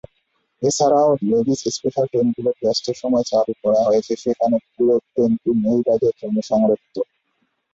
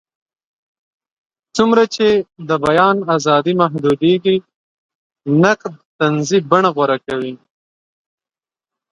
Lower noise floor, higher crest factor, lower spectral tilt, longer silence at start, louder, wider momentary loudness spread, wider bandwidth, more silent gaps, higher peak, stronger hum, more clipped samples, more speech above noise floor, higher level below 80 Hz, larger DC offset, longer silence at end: second, -69 dBFS vs under -90 dBFS; about the same, 14 dB vs 16 dB; about the same, -6 dB/octave vs -5.5 dB/octave; second, 0.6 s vs 1.55 s; second, -19 LUFS vs -15 LUFS; second, 6 LU vs 9 LU; second, 8 kHz vs 11 kHz; second, none vs 4.55-4.89 s, 4.95-5.10 s, 5.85-5.99 s; second, -6 dBFS vs 0 dBFS; neither; neither; second, 51 dB vs over 76 dB; about the same, -58 dBFS vs -56 dBFS; neither; second, 0.7 s vs 1.55 s